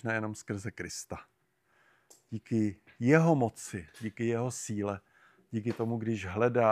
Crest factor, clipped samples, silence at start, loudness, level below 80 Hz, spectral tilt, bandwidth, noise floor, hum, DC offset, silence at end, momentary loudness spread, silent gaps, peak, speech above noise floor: 24 dB; under 0.1%; 0.05 s; -32 LUFS; -66 dBFS; -6.5 dB/octave; 14.5 kHz; -71 dBFS; none; under 0.1%; 0 s; 16 LU; none; -8 dBFS; 40 dB